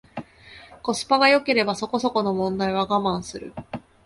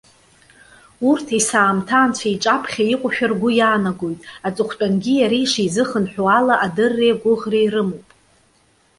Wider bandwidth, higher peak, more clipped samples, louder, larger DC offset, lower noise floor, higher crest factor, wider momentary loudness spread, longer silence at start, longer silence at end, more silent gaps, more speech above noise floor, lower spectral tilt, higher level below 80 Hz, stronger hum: about the same, 11.5 kHz vs 11.5 kHz; about the same, -4 dBFS vs -2 dBFS; neither; second, -22 LUFS vs -18 LUFS; neither; second, -47 dBFS vs -58 dBFS; about the same, 20 dB vs 16 dB; first, 20 LU vs 8 LU; second, 0.15 s vs 1 s; second, 0.25 s vs 0.95 s; neither; second, 25 dB vs 40 dB; about the same, -4.5 dB/octave vs -4 dB/octave; about the same, -56 dBFS vs -58 dBFS; neither